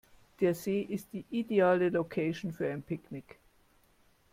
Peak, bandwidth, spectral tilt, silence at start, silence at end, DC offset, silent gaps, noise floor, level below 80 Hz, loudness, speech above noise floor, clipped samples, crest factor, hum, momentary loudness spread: -14 dBFS; 16.5 kHz; -7 dB/octave; 0.4 s; 1.1 s; under 0.1%; none; -67 dBFS; -68 dBFS; -32 LUFS; 35 dB; under 0.1%; 18 dB; none; 14 LU